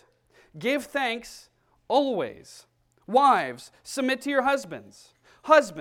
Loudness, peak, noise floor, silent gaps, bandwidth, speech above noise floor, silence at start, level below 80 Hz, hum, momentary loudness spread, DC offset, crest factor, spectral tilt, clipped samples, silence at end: -25 LUFS; -4 dBFS; -61 dBFS; none; 16.5 kHz; 36 dB; 0.55 s; -68 dBFS; none; 21 LU; under 0.1%; 22 dB; -3.5 dB/octave; under 0.1%; 0 s